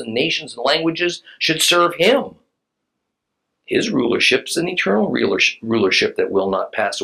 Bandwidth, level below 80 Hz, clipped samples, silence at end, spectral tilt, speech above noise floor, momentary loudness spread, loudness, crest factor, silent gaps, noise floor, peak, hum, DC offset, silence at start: 15 kHz; -64 dBFS; under 0.1%; 0 s; -3 dB/octave; 59 dB; 7 LU; -17 LUFS; 18 dB; none; -77 dBFS; -2 dBFS; none; under 0.1%; 0 s